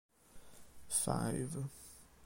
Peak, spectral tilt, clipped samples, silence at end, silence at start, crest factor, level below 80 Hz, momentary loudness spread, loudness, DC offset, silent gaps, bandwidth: -22 dBFS; -4.5 dB/octave; under 0.1%; 0 s; 0.1 s; 20 dB; -64 dBFS; 18 LU; -38 LUFS; under 0.1%; none; 16.5 kHz